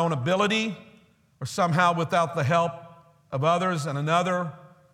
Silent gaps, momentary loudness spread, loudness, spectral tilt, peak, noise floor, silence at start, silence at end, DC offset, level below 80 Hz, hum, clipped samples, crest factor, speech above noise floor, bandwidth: none; 13 LU; -25 LUFS; -5.5 dB/octave; -6 dBFS; -58 dBFS; 0 s; 0.25 s; under 0.1%; -66 dBFS; none; under 0.1%; 20 dB; 34 dB; 14.5 kHz